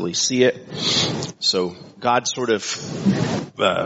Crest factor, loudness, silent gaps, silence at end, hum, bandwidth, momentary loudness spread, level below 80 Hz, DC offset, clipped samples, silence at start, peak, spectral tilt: 18 dB; -21 LUFS; none; 0 s; none; 8 kHz; 6 LU; -58 dBFS; under 0.1%; under 0.1%; 0 s; -2 dBFS; -3 dB/octave